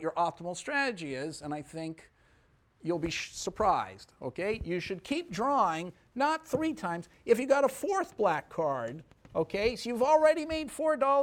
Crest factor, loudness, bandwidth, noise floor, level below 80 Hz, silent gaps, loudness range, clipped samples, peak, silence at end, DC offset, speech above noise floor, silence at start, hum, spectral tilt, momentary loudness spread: 20 dB; -31 LUFS; 17.5 kHz; -66 dBFS; -58 dBFS; none; 6 LU; under 0.1%; -12 dBFS; 0 s; under 0.1%; 35 dB; 0 s; none; -4.5 dB/octave; 14 LU